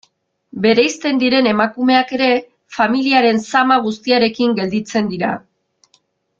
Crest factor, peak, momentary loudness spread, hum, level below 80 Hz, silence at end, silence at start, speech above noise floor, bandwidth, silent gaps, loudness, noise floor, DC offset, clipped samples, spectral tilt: 16 dB; 0 dBFS; 7 LU; none; -60 dBFS; 1 s; 0.55 s; 45 dB; 7.6 kHz; none; -15 LUFS; -60 dBFS; under 0.1%; under 0.1%; -4.5 dB/octave